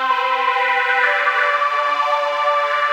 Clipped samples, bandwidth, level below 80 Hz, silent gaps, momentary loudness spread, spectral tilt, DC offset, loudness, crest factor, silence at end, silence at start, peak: under 0.1%; 16 kHz; under -90 dBFS; none; 3 LU; 0.5 dB/octave; under 0.1%; -17 LUFS; 14 dB; 0 s; 0 s; -4 dBFS